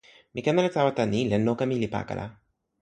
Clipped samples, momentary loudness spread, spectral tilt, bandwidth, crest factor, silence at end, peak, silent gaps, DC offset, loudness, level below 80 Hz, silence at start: under 0.1%; 12 LU; -6.5 dB/octave; 9.2 kHz; 18 dB; 0.5 s; -8 dBFS; none; under 0.1%; -26 LUFS; -56 dBFS; 0.35 s